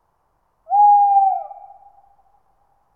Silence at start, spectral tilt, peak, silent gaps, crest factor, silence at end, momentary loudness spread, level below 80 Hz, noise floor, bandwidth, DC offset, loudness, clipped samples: 0.7 s; -6 dB/octave; -6 dBFS; none; 14 dB; 1.4 s; 15 LU; -72 dBFS; -66 dBFS; 2.5 kHz; under 0.1%; -15 LUFS; under 0.1%